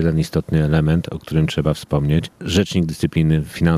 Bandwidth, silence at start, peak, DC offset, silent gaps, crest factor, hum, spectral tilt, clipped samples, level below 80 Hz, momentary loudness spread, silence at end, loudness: 14.5 kHz; 0 s; -2 dBFS; under 0.1%; none; 16 dB; none; -7 dB/octave; under 0.1%; -36 dBFS; 4 LU; 0 s; -19 LUFS